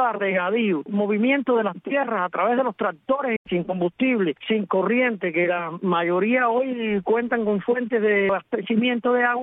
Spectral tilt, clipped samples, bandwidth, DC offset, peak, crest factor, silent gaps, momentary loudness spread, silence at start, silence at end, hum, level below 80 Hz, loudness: -10 dB/octave; under 0.1%; 3.9 kHz; under 0.1%; -8 dBFS; 14 dB; 3.36-3.45 s; 5 LU; 0 s; 0 s; none; -66 dBFS; -22 LUFS